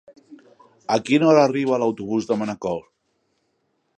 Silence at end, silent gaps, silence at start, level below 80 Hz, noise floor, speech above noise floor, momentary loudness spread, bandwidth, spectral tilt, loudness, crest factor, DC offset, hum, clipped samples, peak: 1.15 s; none; 0.3 s; -64 dBFS; -70 dBFS; 51 dB; 13 LU; 9.4 kHz; -6 dB/octave; -20 LUFS; 20 dB; under 0.1%; none; under 0.1%; -2 dBFS